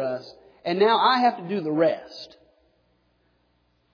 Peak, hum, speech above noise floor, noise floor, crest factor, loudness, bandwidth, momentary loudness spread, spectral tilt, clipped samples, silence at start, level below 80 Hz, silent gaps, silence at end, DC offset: -6 dBFS; none; 45 dB; -67 dBFS; 18 dB; -23 LUFS; 5.4 kHz; 21 LU; -6.5 dB/octave; under 0.1%; 0 s; -74 dBFS; none; 1.7 s; under 0.1%